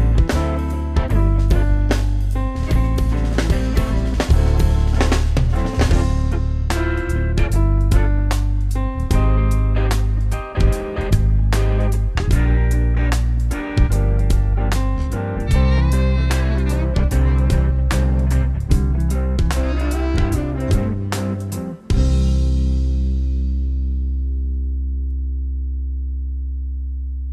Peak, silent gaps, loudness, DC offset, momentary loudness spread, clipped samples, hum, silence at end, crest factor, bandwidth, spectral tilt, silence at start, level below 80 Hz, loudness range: -2 dBFS; none; -19 LUFS; under 0.1%; 7 LU; under 0.1%; none; 0 s; 14 dB; 13.5 kHz; -7 dB/octave; 0 s; -18 dBFS; 3 LU